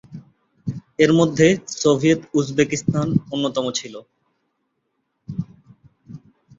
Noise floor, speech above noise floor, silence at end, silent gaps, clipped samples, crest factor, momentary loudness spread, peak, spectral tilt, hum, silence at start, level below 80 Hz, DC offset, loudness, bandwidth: -73 dBFS; 54 dB; 0.4 s; none; under 0.1%; 20 dB; 16 LU; -2 dBFS; -5.5 dB/octave; none; 0.1 s; -56 dBFS; under 0.1%; -19 LUFS; 7.8 kHz